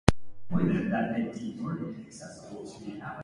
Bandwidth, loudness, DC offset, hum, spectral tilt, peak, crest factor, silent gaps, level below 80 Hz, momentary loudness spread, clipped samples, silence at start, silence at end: 11.5 kHz; -32 LUFS; under 0.1%; none; -6.5 dB/octave; 0 dBFS; 30 dB; none; -44 dBFS; 16 LU; under 0.1%; 0.05 s; 0 s